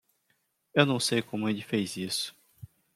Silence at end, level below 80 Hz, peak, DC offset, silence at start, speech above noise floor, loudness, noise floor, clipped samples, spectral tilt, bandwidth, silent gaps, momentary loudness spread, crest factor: 0.3 s; -72 dBFS; -4 dBFS; under 0.1%; 0.75 s; 46 dB; -29 LUFS; -74 dBFS; under 0.1%; -4 dB/octave; 16 kHz; none; 7 LU; 26 dB